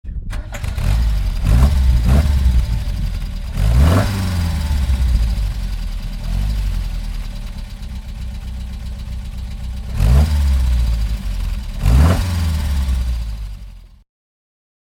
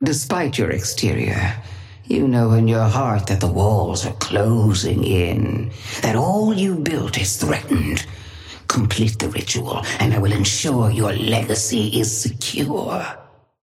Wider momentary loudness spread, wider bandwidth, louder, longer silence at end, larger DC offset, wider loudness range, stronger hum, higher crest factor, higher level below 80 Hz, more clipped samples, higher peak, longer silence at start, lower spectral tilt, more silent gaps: first, 15 LU vs 9 LU; about the same, 16 kHz vs 15.5 kHz; about the same, -19 LUFS vs -19 LUFS; first, 1.05 s vs 0.4 s; neither; first, 10 LU vs 3 LU; neither; about the same, 16 dB vs 16 dB; first, -18 dBFS vs -42 dBFS; neither; first, 0 dBFS vs -4 dBFS; about the same, 0.05 s vs 0 s; first, -6.5 dB/octave vs -5 dB/octave; neither